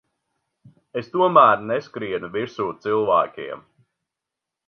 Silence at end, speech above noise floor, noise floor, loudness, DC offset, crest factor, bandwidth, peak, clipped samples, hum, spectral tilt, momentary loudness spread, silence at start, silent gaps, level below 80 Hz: 1.1 s; 65 dB; -85 dBFS; -20 LUFS; under 0.1%; 22 dB; 6.6 kHz; 0 dBFS; under 0.1%; none; -7 dB/octave; 18 LU; 0.95 s; none; -66 dBFS